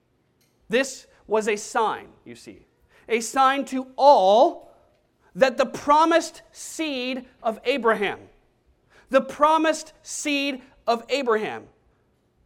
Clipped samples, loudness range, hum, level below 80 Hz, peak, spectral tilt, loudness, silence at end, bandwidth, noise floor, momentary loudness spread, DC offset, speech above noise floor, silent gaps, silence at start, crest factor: under 0.1%; 5 LU; none; -62 dBFS; -4 dBFS; -3 dB/octave; -22 LUFS; 0.85 s; 16 kHz; -66 dBFS; 18 LU; under 0.1%; 43 dB; none; 0.7 s; 20 dB